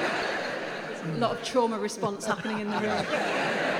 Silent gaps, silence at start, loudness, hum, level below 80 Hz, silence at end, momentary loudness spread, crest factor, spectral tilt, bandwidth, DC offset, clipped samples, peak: none; 0 s; -29 LUFS; none; -70 dBFS; 0 s; 6 LU; 16 dB; -4 dB/octave; 19 kHz; under 0.1%; under 0.1%; -12 dBFS